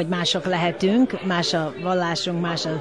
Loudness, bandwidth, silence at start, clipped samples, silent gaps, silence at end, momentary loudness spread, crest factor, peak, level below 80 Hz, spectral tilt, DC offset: -22 LUFS; 10.5 kHz; 0 s; under 0.1%; none; 0 s; 4 LU; 14 dB; -8 dBFS; -60 dBFS; -5 dB/octave; 0.2%